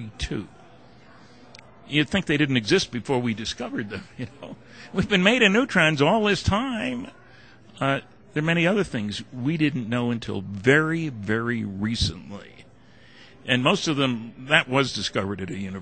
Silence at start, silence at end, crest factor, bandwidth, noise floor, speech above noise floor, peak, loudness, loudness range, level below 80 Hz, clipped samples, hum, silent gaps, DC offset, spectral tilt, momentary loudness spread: 0 s; 0 s; 22 dB; 9.2 kHz; -52 dBFS; 28 dB; -2 dBFS; -23 LUFS; 4 LU; -46 dBFS; under 0.1%; none; none; 0.2%; -5 dB/octave; 16 LU